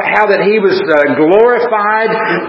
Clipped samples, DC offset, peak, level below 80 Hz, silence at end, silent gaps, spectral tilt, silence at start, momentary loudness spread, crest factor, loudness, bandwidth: 0.2%; under 0.1%; 0 dBFS; -56 dBFS; 0 s; none; -7.5 dB/octave; 0 s; 3 LU; 10 dB; -10 LUFS; 6 kHz